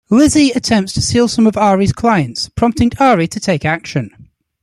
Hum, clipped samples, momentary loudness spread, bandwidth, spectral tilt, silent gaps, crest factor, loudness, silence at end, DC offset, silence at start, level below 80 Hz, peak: none; under 0.1%; 8 LU; 13 kHz; -5 dB/octave; none; 12 dB; -13 LUFS; 0.4 s; under 0.1%; 0.1 s; -38 dBFS; -2 dBFS